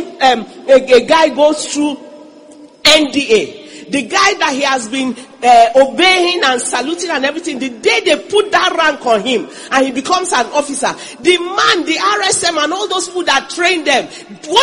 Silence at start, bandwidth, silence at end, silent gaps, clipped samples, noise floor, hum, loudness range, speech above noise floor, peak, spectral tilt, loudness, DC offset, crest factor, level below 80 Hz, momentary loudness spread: 0 s; 16 kHz; 0 s; none; 0.2%; -38 dBFS; none; 2 LU; 26 dB; 0 dBFS; -1.5 dB/octave; -12 LUFS; under 0.1%; 14 dB; -52 dBFS; 10 LU